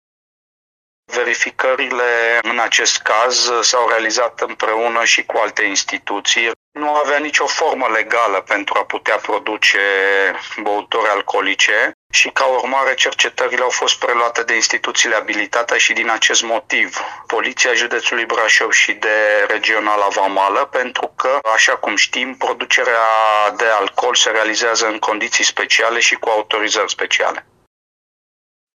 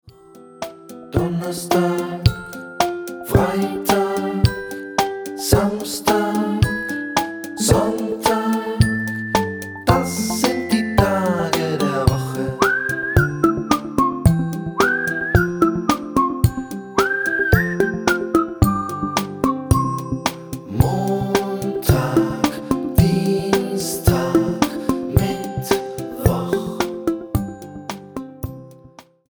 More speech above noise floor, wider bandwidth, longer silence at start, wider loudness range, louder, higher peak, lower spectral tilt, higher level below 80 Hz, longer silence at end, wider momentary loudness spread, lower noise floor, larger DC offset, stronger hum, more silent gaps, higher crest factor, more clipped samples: first, over 74 dB vs 28 dB; second, 13 kHz vs over 20 kHz; first, 1.1 s vs 0.05 s; about the same, 2 LU vs 3 LU; first, -15 LUFS vs -20 LUFS; about the same, 0 dBFS vs 0 dBFS; second, 1 dB/octave vs -5.5 dB/octave; second, -68 dBFS vs -34 dBFS; first, 1.35 s vs 0.3 s; about the same, 6 LU vs 8 LU; first, under -90 dBFS vs -46 dBFS; neither; neither; first, 6.56-6.72 s, 11.94-12.10 s vs none; about the same, 16 dB vs 20 dB; neither